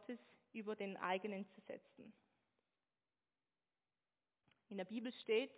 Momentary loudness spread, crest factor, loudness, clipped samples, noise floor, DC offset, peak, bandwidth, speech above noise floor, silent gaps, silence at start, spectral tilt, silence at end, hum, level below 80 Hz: 16 LU; 22 dB; -47 LUFS; under 0.1%; under -90 dBFS; under 0.1%; -26 dBFS; 4 kHz; over 44 dB; none; 0 s; -3 dB/octave; 0 s; none; under -90 dBFS